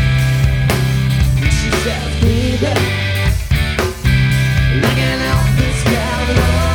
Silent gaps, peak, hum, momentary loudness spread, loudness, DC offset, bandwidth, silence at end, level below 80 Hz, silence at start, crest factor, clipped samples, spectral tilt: none; 0 dBFS; none; 3 LU; -15 LUFS; under 0.1%; 18 kHz; 0 s; -20 dBFS; 0 s; 14 dB; under 0.1%; -5.5 dB/octave